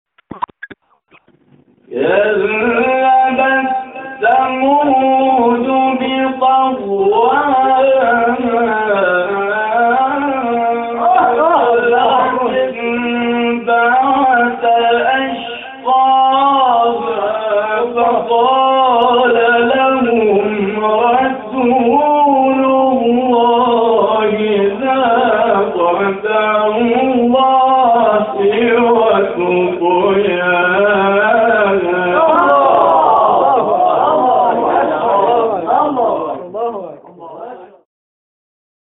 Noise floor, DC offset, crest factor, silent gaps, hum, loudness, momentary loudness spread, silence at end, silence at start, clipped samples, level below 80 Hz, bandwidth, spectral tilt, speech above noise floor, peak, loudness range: -51 dBFS; under 0.1%; 12 dB; none; none; -12 LUFS; 6 LU; 1.35 s; 0.3 s; under 0.1%; -52 dBFS; 4 kHz; -2.5 dB/octave; 39 dB; 0 dBFS; 3 LU